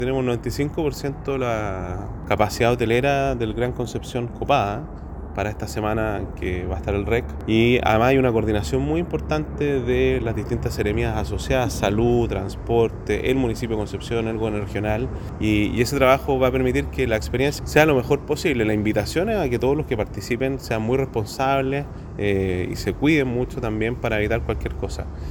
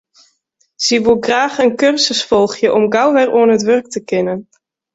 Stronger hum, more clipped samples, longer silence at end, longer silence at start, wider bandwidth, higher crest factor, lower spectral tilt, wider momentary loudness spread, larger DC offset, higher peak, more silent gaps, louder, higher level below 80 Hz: neither; neither; second, 0 s vs 0.5 s; second, 0 s vs 0.8 s; first, 18 kHz vs 8 kHz; first, 20 dB vs 14 dB; first, -6.5 dB/octave vs -3.5 dB/octave; first, 9 LU vs 6 LU; neither; about the same, 0 dBFS vs -2 dBFS; neither; second, -22 LUFS vs -13 LUFS; first, -34 dBFS vs -52 dBFS